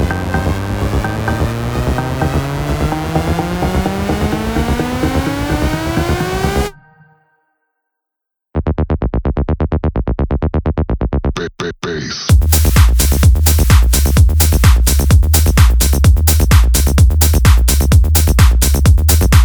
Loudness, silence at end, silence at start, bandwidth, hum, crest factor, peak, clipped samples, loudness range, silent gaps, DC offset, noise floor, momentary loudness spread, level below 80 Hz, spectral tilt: -13 LUFS; 0 s; 0 s; over 20 kHz; none; 12 dB; 0 dBFS; under 0.1%; 9 LU; none; under 0.1%; -80 dBFS; 8 LU; -14 dBFS; -5 dB/octave